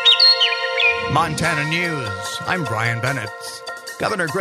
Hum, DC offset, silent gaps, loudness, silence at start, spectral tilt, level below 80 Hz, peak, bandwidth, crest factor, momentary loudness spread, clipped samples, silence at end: none; under 0.1%; none; -17 LUFS; 0 s; -3 dB/octave; -50 dBFS; -2 dBFS; 13.5 kHz; 18 dB; 18 LU; under 0.1%; 0 s